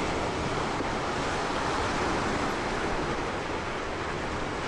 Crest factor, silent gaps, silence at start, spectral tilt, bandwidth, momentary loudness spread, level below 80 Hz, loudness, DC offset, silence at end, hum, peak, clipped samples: 12 dB; none; 0 s; -4.5 dB/octave; 12 kHz; 4 LU; -42 dBFS; -30 LUFS; under 0.1%; 0 s; none; -18 dBFS; under 0.1%